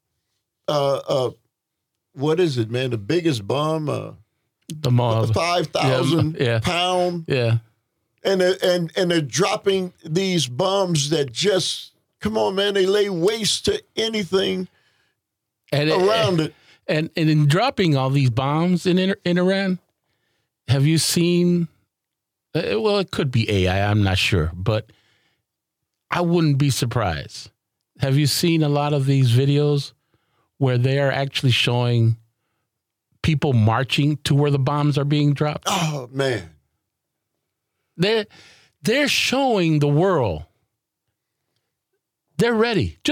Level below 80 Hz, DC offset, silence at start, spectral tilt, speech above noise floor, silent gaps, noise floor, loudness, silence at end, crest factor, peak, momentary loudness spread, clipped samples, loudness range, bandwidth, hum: -52 dBFS; under 0.1%; 0.7 s; -5.5 dB/octave; 63 dB; none; -82 dBFS; -20 LUFS; 0 s; 14 dB; -6 dBFS; 8 LU; under 0.1%; 4 LU; 16 kHz; none